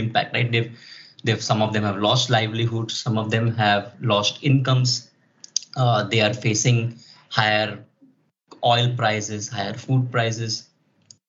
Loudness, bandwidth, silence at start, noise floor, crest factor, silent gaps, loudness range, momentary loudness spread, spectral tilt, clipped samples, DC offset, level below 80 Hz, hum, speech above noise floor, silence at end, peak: -22 LUFS; 7.8 kHz; 0 s; -58 dBFS; 22 dB; none; 3 LU; 9 LU; -4 dB/octave; under 0.1%; under 0.1%; -68 dBFS; none; 37 dB; 0.65 s; 0 dBFS